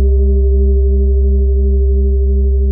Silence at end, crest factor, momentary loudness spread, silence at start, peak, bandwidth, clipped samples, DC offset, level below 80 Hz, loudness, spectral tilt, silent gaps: 0 s; 6 dB; 1 LU; 0 s; -4 dBFS; 0.7 kHz; under 0.1%; under 0.1%; -10 dBFS; -13 LUFS; -17 dB/octave; none